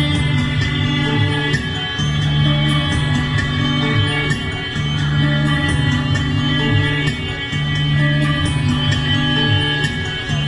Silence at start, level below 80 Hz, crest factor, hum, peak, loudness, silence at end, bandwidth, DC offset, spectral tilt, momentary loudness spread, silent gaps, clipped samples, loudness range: 0 s; -32 dBFS; 14 dB; none; -4 dBFS; -17 LUFS; 0 s; 11 kHz; under 0.1%; -5.5 dB/octave; 5 LU; none; under 0.1%; 1 LU